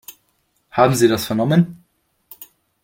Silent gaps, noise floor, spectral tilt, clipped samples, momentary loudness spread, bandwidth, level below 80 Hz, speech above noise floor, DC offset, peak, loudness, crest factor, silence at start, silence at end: none; -66 dBFS; -6 dB/octave; under 0.1%; 25 LU; 17 kHz; -54 dBFS; 50 dB; under 0.1%; -2 dBFS; -17 LUFS; 18 dB; 0.1 s; 0.4 s